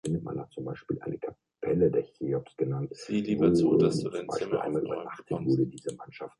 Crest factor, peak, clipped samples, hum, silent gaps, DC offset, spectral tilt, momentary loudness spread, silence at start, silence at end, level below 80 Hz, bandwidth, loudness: 18 dB; -12 dBFS; under 0.1%; none; none; under 0.1%; -7.5 dB/octave; 15 LU; 0.05 s; 0.1 s; -58 dBFS; 11.5 kHz; -29 LUFS